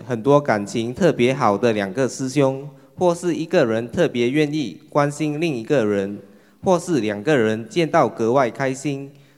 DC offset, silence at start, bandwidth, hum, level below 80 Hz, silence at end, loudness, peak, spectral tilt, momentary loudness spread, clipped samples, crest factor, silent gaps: under 0.1%; 0 s; 13 kHz; none; -60 dBFS; 0.3 s; -20 LUFS; -2 dBFS; -6 dB/octave; 8 LU; under 0.1%; 18 dB; none